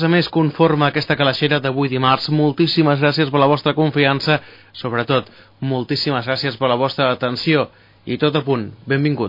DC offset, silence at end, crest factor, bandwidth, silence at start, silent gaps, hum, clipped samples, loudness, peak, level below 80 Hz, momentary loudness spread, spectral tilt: under 0.1%; 0 s; 16 dB; 5.4 kHz; 0 s; none; none; under 0.1%; -17 LUFS; -2 dBFS; -56 dBFS; 8 LU; -7.5 dB/octave